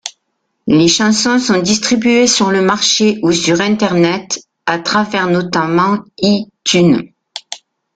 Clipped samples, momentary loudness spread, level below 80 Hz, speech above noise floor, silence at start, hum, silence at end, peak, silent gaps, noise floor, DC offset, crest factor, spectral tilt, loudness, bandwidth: under 0.1%; 15 LU; -50 dBFS; 56 dB; 0.05 s; none; 0.4 s; 0 dBFS; none; -68 dBFS; under 0.1%; 14 dB; -4 dB/octave; -12 LUFS; 9.4 kHz